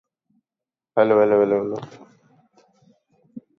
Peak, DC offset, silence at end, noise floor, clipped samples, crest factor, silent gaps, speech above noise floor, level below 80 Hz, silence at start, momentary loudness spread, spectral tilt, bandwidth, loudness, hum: -4 dBFS; under 0.1%; 0.2 s; -90 dBFS; under 0.1%; 20 dB; none; 71 dB; -70 dBFS; 0.95 s; 16 LU; -8 dB/octave; 6.4 kHz; -19 LUFS; none